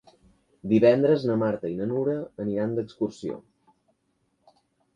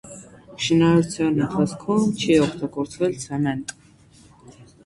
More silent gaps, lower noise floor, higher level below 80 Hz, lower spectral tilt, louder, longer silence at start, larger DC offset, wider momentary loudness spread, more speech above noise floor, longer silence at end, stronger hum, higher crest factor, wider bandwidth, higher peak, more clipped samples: neither; first, -72 dBFS vs -51 dBFS; second, -64 dBFS vs -52 dBFS; first, -8.5 dB/octave vs -6 dB/octave; second, -25 LUFS vs -21 LUFS; first, 0.65 s vs 0.05 s; neither; first, 17 LU vs 12 LU; first, 48 dB vs 31 dB; first, 1.55 s vs 0.2 s; neither; about the same, 20 dB vs 18 dB; second, 9.2 kHz vs 11.5 kHz; about the same, -8 dBFS vs -6 dBFS; neither